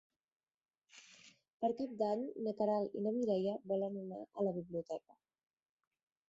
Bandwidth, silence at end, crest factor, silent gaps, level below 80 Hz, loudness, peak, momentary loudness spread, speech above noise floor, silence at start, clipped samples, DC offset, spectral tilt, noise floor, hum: 7.8 kHz; 1.3 s; 18 dB; 1.53-1.60 s; -82 dBFS; -39 LUFS; -24 dBFS; 11 LU; 26 dB; 0.95 s; under 0.1%; under 0.1%; -7.5 dB/octave; -64 dBFS; none